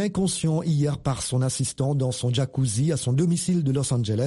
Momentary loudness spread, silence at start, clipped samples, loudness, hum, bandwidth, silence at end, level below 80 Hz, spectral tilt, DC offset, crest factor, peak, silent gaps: 3 LU; 0 s; under 0.1%; -24 LUFS; none; 11.5 kHz; 0 s; -50 dBFS; -6 dB/octave; under 0.1%; 12 dB; -12 dBFS; none